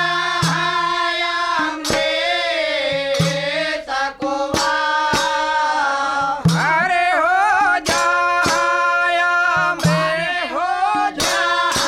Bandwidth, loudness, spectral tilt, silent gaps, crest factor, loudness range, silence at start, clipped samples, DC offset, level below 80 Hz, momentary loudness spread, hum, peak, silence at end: 16 kHz; -17 LUFS; -3.5 dB/octave; none; 14 dB; 3 LU; 0 s; under 0.1%; under 0.1%; -48 dBFS; 4 LU; none; -2 dBFS; 0 s